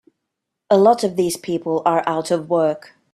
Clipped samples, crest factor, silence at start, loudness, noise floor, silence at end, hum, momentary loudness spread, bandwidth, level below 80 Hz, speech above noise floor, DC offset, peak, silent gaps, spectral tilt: under 0.1%; 18 dB; 0.7 s; -18 LUFS; -80 dBFS; 0.35 s; none; 8 LU; 14.5 kHz; -64 dBFS; 62 dB; under 0.1%; -2 dBFS; none; -5.5 dB/octave